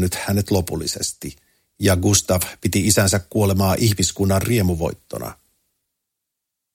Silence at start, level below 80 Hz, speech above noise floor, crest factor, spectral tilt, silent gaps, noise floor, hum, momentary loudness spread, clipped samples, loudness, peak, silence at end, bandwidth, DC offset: 0 s; -42 dBFS; 62 dB; 20 dB; -4.5 dB/octave; none; -81 dBFS; none; 15 LU; under 0.1%; -19 LUFS; 0 dBFS; 1.4 s; 17 kHz; under 0.1%